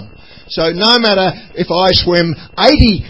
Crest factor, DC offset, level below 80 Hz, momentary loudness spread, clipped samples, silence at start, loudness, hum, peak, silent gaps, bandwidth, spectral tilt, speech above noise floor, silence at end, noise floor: 12 dB; 0.9%; -26 dBFS; 9 LU; 0.4%; 0 s; -11 LUFS; none; 0 dBFS; none; 8 kHz; -6 dB/octave; 25 dB; 0 s; -37 dBFS